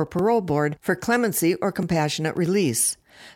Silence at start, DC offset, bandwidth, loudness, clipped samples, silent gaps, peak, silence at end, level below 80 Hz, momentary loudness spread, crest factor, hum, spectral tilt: 0 s; under 0.1%; 17.5 kHz; -22 LUFS; under 0.1%; none; -8 dBFS; 0.05 s; -56 dBFS; 4 LU; 14 dB; none; -4.5 dB/octave